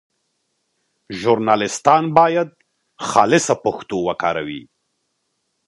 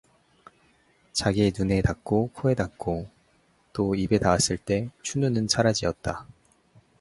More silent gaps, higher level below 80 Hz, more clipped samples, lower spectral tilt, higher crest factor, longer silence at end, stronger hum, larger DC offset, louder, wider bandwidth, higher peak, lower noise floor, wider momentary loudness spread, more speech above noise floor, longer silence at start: neither; second, -58 dBFS vs -44 dBFS; neither; about the same, -4.5 dB/octave vs -5 dB/octave; about the same, 20 dB vs 22 dB; first, 1.05 s vs 0.75 s; neither; neither; first, -17 LUFS vs -25 LUFS; about the same, 11.5 kHz vs 11.5 kHz; first, 0 dBFS vs -4 dBFS; first, -71 dBFS vs -64 dBFS; first, 14 LU vs 11 LU; first, 54 dB vs 39 dB; about the same, 1.1 s vs 1.15 s